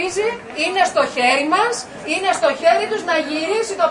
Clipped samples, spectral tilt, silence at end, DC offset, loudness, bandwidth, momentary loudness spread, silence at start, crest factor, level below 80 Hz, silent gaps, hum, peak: under 0.1%; -2 dB/octave; 0 s; under 0.1%; -18 LUFS; 11 kHz; 6 LU; 0 s; 16 dB; -58 dBFS; none; none; -2 dBFS